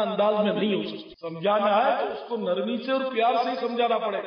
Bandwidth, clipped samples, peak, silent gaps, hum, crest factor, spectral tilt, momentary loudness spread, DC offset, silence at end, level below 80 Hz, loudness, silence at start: 6.2 kHz; under 0.1%; -12 dBFS; none; none; 12 dB; -7.5 dB/octave; 8 LU; under 0.1%; 0 s; -74 dBFS; -25 LUFS; 0 s